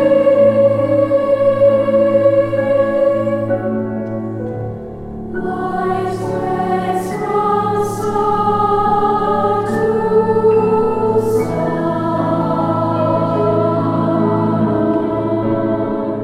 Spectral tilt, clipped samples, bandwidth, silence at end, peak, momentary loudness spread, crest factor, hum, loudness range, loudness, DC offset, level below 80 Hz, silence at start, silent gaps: -8 dB/octave; under 0.1%; 13.5 kHz; 0 s; -2 dBFS; 9 LU; 14 dB; none; 6 LU; -15 LUFS; under 0.1%; -42 dBFS; 0 s; none